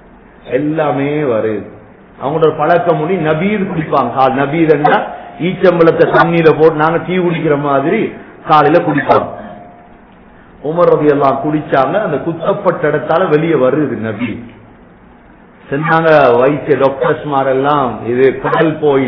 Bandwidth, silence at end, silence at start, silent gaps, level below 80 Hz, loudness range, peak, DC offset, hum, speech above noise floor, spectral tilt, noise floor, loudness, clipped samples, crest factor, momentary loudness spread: 5.4 kHz; 0 s; 0.45 s; none; -46 dBFS; 4 LU; 0 dBFS; under 0.1%; none; 29 dB; -9.5 dB/octave; -40 dBFS; -12 LUFS; 0.6%; 12 dB; 11 LU